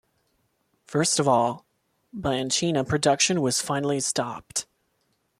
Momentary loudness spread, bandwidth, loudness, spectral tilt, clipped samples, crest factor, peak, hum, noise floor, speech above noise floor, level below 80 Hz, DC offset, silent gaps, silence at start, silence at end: 11 LU; 15 kHz; -24 LUFS; -3.5 dB/octave; under 0.1%; 18 dB; -8 dBFS; none; -72 dBFS; 48 dB; -58 dBFS; under 0.1%; none; 0.9 s; 0.75 s